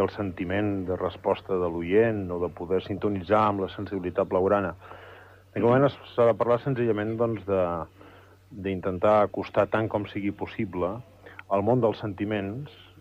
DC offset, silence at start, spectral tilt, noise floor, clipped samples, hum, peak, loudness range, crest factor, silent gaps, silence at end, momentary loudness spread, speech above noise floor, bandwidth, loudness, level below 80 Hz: under 0.1%; 0 s; -9 dB/octave; -51 dBFS; under 0.1%; none; -10 dBFS; 2 LU; 18 dB; none; 0.15 s; 13 LU; 26 dB; 8 kHz; -26 LUFS; -58 dBFS